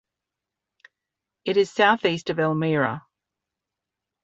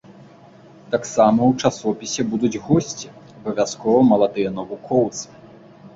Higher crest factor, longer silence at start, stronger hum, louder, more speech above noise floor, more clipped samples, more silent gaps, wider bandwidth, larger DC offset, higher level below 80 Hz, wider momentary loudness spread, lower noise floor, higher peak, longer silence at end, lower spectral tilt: about the same, 22 dB vs 18 dB; first, 1.45 s vs 0.1 s; neither; about the same, -22 LUFS vs -20 LUFS; first, 64 dB vs 27 dB; neither; neither; about the same, 8 kHz vs 7.8 kHz; neither; second, -68 dBFS vs -54 dBFS; second, 9 LU vs 16 LU; first, -86 dBFS vs -46 dBFS; about the same, -4 dBFS vs -2 dBFS; first, 1.25 s vs 0.1 s; about the same, -6 dB/octave vs -5.5 dB/octave